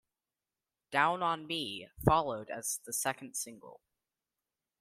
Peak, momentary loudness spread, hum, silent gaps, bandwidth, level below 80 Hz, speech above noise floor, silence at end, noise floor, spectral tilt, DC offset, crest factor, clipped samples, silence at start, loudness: -10 dBFS; 10 LU; none; none; 16 kHz; -56 dBFS; over 56 dB; 1.05 s; under -90 dBFS; -3.5 dB/octave; under 0.1%; 26 dB; under 0.1%; 0.9 s; -33 LUFS